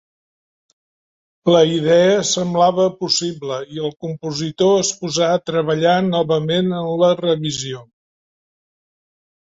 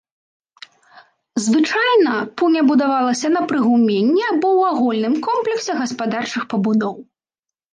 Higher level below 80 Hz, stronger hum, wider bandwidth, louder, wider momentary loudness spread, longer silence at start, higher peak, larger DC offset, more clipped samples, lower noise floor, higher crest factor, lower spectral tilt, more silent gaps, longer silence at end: first, -60 dBFS vs -70 dBFS; neither; second, 8 kHz vs 9.8 kHz; about the same, -17 LUFS vs -17 LUFS; first, 11 LU vs 7 LU; about the same, 1.45 s vs 1.35 s; first, -2 dBFS vs -6 dBFS; neither; neither; about the same, under -90 dBFS vs -87 dBFS; about the same, 16 dB vs 12 dB; about the same, -4.5 dB/octave vs -5 dB/octave; neither; first, 1.6 s vs 0.7 s